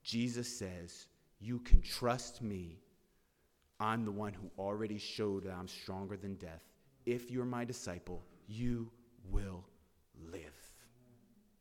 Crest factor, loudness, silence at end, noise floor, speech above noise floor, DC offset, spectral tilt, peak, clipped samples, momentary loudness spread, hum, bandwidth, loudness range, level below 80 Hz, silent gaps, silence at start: 28 dB; -41 LUFS; 0.9 s; -75 dBFS; 38 dB; under 0.1%; -5.5 dB/octave; -10 dBFS; under 0.1%; 16 LU; none; 15 kHz; 6 LU; -42 dBFS; none; 0.05 s